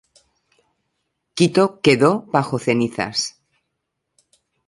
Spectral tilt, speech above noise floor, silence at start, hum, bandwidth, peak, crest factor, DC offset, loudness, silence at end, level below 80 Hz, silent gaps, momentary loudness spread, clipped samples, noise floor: -5 dB/octave; 59 dB; 1.35 s; none; 11.5 kHz; -2 dBFS; 20 dB; under 0.1%; -18 LUFS; 1.4 s; -62 dBFS; none; 8 LU; under 0.1%; -77 dBFS